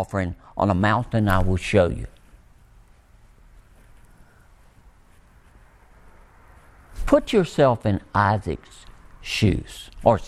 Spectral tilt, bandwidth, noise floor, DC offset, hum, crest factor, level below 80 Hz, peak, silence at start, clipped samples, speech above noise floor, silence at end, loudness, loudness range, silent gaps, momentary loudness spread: -6.5 dB/octave; 14 kHz; -52 dBFS; under 0.1%; none; 22 dB; -38 dBFS; -2 dBFS; 0 s; under 0.1%; 31 dB; 0 s; -22 LUFS; 7 LU; none; 15 LU